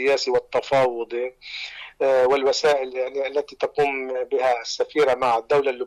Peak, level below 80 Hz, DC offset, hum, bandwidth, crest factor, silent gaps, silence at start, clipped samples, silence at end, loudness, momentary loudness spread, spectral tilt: -12 dBFS; -60 dBFS; under 0.1%; none; 12 kHz; 10 dB; none; 0 s; under 0.1%; 0 s; -22 LUFS; 10 LU; -3.5 dB/octave